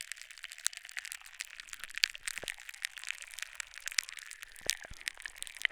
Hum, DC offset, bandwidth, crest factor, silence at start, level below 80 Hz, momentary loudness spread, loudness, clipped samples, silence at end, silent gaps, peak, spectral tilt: none; under 0.1%; over 20 kHz; 38 dB; 0 s; -64 dBFS; 12 LU; -38 LUFS; under 0.1%; 0 s; none; -4 dBFS; 2.5 dB/octave